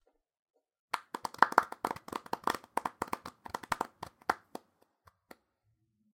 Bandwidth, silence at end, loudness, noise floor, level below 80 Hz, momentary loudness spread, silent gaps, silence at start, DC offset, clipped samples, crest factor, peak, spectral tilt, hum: 17 kHz; 1.8 s; -35 LUFS; -77 dBFS; -70 dBFS; 15 LU; none; 0.95 s; under 0.1%; under 0.1%; 34 dB; -4 dBFS; -3 dB/octave; none